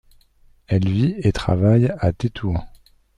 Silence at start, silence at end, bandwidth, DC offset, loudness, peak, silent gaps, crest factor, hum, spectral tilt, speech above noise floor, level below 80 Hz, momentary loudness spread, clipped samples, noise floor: 0.7 s; 0.5 s; 10.5 kHz; under 0.1%; -20 LUFS; -4 dBFS; none; 16 dB; none; -8.5 dB/octave; 35 dB; -38 dBFS; 9 LU; under 0.1%; -54 dBFS